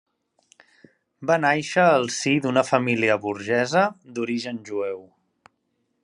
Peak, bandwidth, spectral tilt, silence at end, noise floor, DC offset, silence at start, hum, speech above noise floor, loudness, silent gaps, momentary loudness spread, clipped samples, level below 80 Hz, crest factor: -2 dBFS; 11 kHz; -4.5 dB/octave; 1 s; -73 dBFS; under 0.1%; 1.2 s; none; 51 dB; -22 LUFS; none; 11 LU; under 0.1%; -72 dBFS; 22 dB